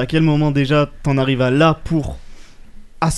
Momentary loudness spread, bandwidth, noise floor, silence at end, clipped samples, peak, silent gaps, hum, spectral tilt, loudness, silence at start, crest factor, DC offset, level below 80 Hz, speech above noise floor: 8 LU; 12 kHz; -36 dBFS; 0 s; under 0.1%; 0 dBFS; none; none; -6.5 dB/octave; -16 LUFS; 0 s; 16 dB; under 0.1%; -34 dBFS; 20 dB